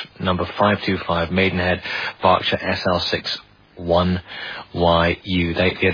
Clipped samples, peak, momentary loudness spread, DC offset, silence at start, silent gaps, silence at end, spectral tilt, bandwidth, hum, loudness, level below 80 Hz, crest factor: under 0.1%; -2 dBFS; 9 LU; under 0.1%; 0 s; none; 0 s; -6.5 dB/octave; 5.2 kHz; none; -20 LUFS; -42 dBFS; 18 dB